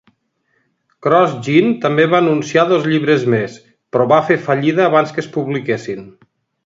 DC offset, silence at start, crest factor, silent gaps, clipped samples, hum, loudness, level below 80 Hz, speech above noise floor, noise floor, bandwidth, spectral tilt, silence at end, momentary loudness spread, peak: under 0.1%; 1.05 s; 16 dB; none; under 0.1%; none; -15 LUFS; -60 dBFS; 50 dB; -65 dBFS; 7.8 kHz; -6.5 dB/octave; 0.55 s; 9 LU; 0 dBFS